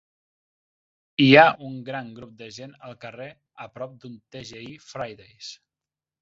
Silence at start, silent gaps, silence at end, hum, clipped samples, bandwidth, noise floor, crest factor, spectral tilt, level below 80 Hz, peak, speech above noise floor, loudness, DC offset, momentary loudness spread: 1.2 s; none; 0.7 s; none; under 0.1%; 7.6 kHz; under -90 dBFS; 24 dB; -3.5 dB/octave; -66 dBFS; -2 dBFS; over 66 dB; -18 LUFS; under 0.1%; 27 LU